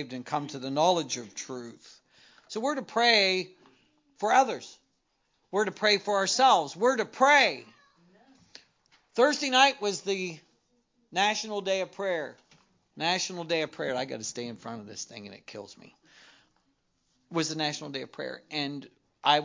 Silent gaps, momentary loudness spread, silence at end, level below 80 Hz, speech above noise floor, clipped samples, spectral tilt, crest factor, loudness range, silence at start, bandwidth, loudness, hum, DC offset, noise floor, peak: none; 19 LU; 0 s; -80 dBFS; 47 dB; under 0.1%; -2.5 dB/octave; 22 dB; 11 LU; 0 s; 7.6 kHz; -27 LUFS; none; under 0.1%; -75 dBFS; -6 dBFS